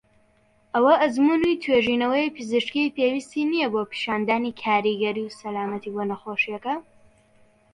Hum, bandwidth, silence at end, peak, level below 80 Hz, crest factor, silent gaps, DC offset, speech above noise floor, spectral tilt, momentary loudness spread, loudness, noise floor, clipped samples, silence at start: none; 11 kHz; 0.95 s; -6 dBFS; -62 dBFS; 18 dB; none; under 0.1%; 38 dB; -5 dB/octave; 10 LU; -23 LUFS; -61 dBFS; under 0.1%; 0.75 s